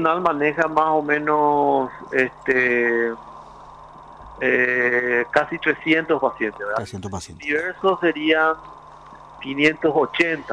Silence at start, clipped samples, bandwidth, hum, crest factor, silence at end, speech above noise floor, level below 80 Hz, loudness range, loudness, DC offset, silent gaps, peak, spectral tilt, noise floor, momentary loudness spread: 0 s; under 0.1%; 10.5 kHz; none; 18 dB; 0 s; 22 dB; -54 dBFS; 2 LU; -20 LUFS; under 0.1%; none; -4 dBFS; -5.5 dB/octave; -43 dBFS; 10 LU